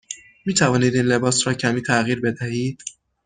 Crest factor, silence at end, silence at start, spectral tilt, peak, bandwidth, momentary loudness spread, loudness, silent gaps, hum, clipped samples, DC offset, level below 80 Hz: 18 dB; 0.35 s; 0.1 s; -4.5 dB/octave; -4 dBFS; 10 kHz; 13 LU; -20 LUFS; none; none; under 0.1%; under 0.1%; -56 dBFS